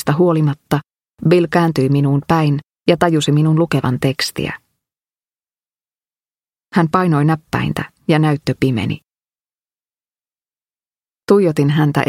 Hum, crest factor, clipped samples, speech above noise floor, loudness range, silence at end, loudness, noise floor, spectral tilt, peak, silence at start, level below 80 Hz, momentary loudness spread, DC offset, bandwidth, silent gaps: none; 16 dB; under 0.1%; over 75 dB; 6 LU; 0.05 s; -16 LUFS; under -90 dBFS; -7 dB/octave; 0 dBFS; 0 s; -50 dBFS; 8 LU; under 0.1%; 15.5 kHz; 9.40-9.44 s